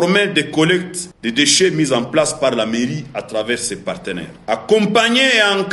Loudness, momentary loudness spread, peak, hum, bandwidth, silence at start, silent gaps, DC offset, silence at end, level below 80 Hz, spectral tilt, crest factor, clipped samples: -16 LUFS; 13 LU; 0 dBFS; none; 11.5 kHz; 0 s; none; under 0.1%; 0 s; -52 dBFS; -3 dB/octave; 16 dB; under 0.1%